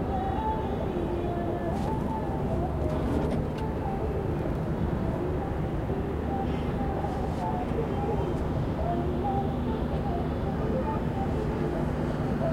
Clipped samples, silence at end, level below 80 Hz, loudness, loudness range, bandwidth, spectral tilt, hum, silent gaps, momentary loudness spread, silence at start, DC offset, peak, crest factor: under 0.1%; 0 s; -36 dBFS; -30 LUFS; 1 LU; 15.5 kHz; -8.5 dB/octave; none; none; 2 LU; 0 s; under 0.1%; -14 dBFS; 14 dB